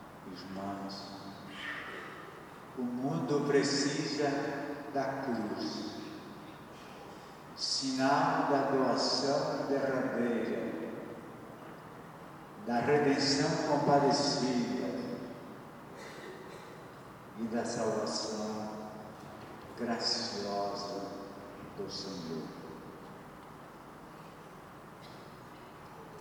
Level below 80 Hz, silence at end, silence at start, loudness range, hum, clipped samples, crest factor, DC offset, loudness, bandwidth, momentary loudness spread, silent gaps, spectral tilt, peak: -70 dBFS; 0 s; 0 s; 13 LU; none; under 0.1%; 20 dB; under 0.1%; -33 LUFS; 20 kHz; 21 LU; none; -4.5 dB/octave; -14 dBFS